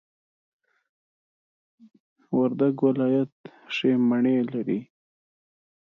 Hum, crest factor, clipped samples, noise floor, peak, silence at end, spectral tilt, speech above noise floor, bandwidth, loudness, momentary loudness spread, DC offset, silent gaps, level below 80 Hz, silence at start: none; 18 dB; under 0.1%; under -90 dBFS; -10 dBFS; 1 s; -8 dB/octave; over 67 dB; 6.4 kHz; -24 LUFS; 9 LU; under 0.1%; 3.32-3.44 s; -76 dBFS; 2.3 s